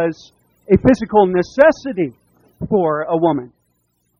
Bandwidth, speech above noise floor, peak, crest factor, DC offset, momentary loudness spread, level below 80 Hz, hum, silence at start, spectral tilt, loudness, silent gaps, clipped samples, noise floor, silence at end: 7 kHz; 50 dB; 0 dBFS; 16 dB; under 0.1%; 11 LU; -44 dBFS; none; 0 s; -7.5 dB/octave; -16 LUFS; none; under 0.1%; -66 dBFS; 0.75 s